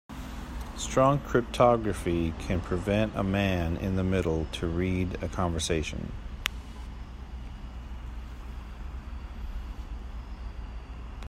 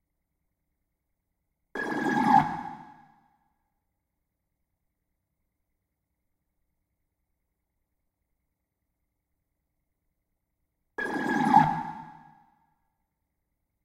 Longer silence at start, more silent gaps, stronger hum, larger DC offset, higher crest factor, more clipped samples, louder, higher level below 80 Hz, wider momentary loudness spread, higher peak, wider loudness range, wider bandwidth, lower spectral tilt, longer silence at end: second, 0.1 s vs 1.75 s; neither; neither; neither; about the same, 24 dB vs 26 dB; neither; second, -29 LUFS vs -25 LUFS; first, -40 dBFS vs -66 dBFS; about the same, 18 LU vs 20 LU; about the same, -6 dBFS vs -6 dBFS; first, 15 LU vs 9 LU; about the same, 15.5 kHz vs 14.5 kHz; about the same, -6 dB/octave vs -6 dB/octave; second, 0 s vs 1.75 s